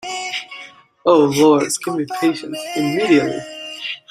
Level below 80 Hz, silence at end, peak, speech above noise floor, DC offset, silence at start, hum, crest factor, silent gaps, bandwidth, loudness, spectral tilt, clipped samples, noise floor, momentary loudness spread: -62 dBFS; 0.1 s; -2 dBFS; 24 dB; under 0.1%; 0 s; none; 16 dB; none; 15 kHz; -18 LUFS; -4.5 dB/octave; under 0.1%; -40 dBFS; 14 LU